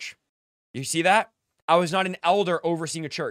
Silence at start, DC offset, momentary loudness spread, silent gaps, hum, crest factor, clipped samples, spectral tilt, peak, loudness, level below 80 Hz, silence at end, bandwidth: 0 s; under 0.1%; 17 LU; 0.29-0.74 s, 1.62-1.68 s; none; 18 dB; under 0.1%; -4 dB/octave; -6 dBFS; -23 LUFS; -72 dBFS; 0 s; 15 kHz